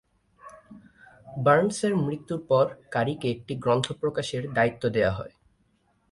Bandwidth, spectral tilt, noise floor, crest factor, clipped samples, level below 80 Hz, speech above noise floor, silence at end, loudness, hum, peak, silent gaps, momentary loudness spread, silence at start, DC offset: 11.5 kHz; -6 dB/octave; -68 dBFS; 20 dB; under 0.1%; -56 dBFS; 43 dB; 0.85 s; -26 LUFS; none; -6 dBFS; none; 11 LU; 0.45 s; under 0.1%